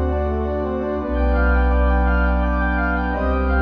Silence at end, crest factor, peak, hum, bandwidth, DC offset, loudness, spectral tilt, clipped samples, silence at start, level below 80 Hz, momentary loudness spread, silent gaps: 0 s; 12 dB; -6 dBFS; none; 5 kHz; under 0.1%; -20 LUFS; -10 dB/octave; under 0.1%; 0 s; -20 dBFS; 5 LU; none